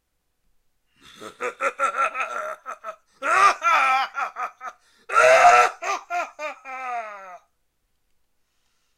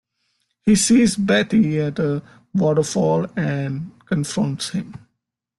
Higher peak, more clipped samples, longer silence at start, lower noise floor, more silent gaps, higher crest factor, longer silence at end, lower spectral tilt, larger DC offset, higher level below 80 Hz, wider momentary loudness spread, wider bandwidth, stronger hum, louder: first, -2 dBFS vs -6 dBFS; neither; first, 1.2 s vs 0.65 s; second, -70 dBFS vs -77 dBFS; neither; first, 22 dB vs 14 dB; first, 1.6 s vs 0.6 s; second, -0.5 dB/octave vs -5 dB/octave; neither; second, -66 dBFS vs -54 dBFS; first, 23 LU vs 12 LU; first, 15.5 kHz vs 12.5 kHz; neither; about the same, -20 LUFS vs -20 LUFS